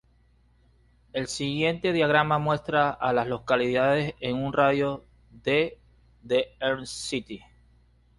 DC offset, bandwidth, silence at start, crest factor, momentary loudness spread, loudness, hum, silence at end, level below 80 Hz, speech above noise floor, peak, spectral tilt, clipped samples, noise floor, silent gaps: under 0.1%; 11.5 kHz; 1.15 s; 18 dB; 11 LU; -26 LUFS; none; 0.8 s; -56 dBFS; 36 dB; -8 dBFS; -5 dB/octave; under 0.1%; -62 dBFS; none